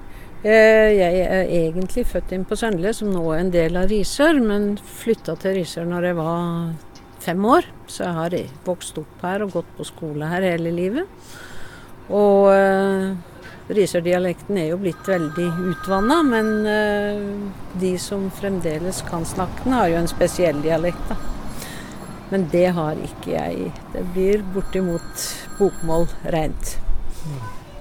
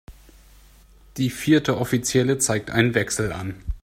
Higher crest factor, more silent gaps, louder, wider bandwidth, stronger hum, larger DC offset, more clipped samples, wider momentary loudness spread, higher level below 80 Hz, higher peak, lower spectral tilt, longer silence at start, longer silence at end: about the same, 18 dB vs 20 dB; neither; about the same, -21 LUFS vs -22 LUFS; about the same, 17.5 kHz vs 16 kHz; neither; neither; neither; first, 15 LU vs 10 LU; first, -34 dBFS vs -42 dBFS; about the same, -2 dBFS vs -4 dBFS; about the same, -5.5 dB/octave vs -4.5 dB/octave; about the same, 0 s vs 0.1 s; about the same, 0 s vs 0.05 s